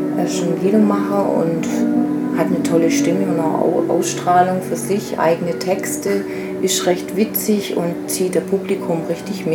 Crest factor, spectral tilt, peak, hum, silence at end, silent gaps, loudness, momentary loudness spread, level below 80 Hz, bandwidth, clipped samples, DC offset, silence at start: 16 dB; -5 dB/octave; -2 dBFS; none; 0 s; none; -18 LUFS; 6 LU; -60 dBFS; 18.5 kHz; under 0.1%; under 0.1%; 0 s